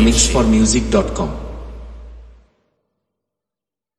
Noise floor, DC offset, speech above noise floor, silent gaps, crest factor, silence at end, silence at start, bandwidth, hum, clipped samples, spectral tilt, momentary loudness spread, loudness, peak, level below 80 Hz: -88 dBFS; under 0.1%; 73 dB; none; 18 dB; 1.75 s; 0 s; 12.5 kHz; none; under 0.1%; -4 dB/octave; 22 LU; -15 LUFS; 0 dBFS; -26 dBFS